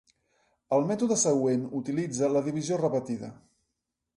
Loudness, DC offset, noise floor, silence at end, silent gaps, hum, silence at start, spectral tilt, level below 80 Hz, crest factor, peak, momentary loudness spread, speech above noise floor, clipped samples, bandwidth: -28 LUFS; under 0.1%; -84 dBFS; 0.8 s; none; none; 0.7 s; -5.5 dB/octave; -70 dBFS; 16 dB; -12 dBFS; 8 LU; 56 dB; under 0.1%; 11.5 kHz